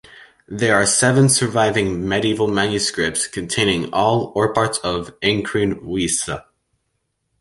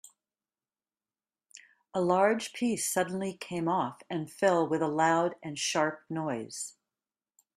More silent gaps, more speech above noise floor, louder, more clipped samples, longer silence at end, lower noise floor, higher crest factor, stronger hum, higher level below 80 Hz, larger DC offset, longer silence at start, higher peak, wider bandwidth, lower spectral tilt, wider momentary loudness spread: neither; second, 54 dB vs over 60 dB; first, -18 LUFS vs -30 LUFS; neither; first, 1 s vs 0.85 s; second, -72 dBFS vs under -90 dBFS; about the same, 18 dB vs 20 dB; neither; first, -46 dBFS vs -74 dBFS; neither; second, 0.1 s vs 1.55 s; first, -2 dBFS vs -12 dBFS; second, 12 kHz vs 15.5 kHz; about the same, -3.5 dB/octave vs -4 dB/octave; second, 8 LU vs 11 LU